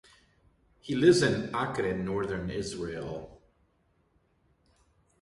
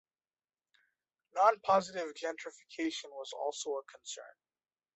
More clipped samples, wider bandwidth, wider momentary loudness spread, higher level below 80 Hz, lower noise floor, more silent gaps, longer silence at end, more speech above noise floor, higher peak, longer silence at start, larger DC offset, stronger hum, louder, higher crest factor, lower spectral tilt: neither; first, 11.5 kHz vs 8.2 kHz; about the same, 16 LU vs 17 LU; first, -56 dBFS vs -84 dBFS; second, -70 dBFS vs under -90 dBFS; neither; first, 1.85 s vs 0.65 s; second, 42 dB vs over 55 dB; about the same, -10 dBFS vs -12 dBFS; second, 0.85 s vs 1.35 s; neither; neither; first, -29 LUFS vs -34 LUFS; about the same, 22 dB vs 24 dB; first, -5.5 dB/octave vs -3 dB/octave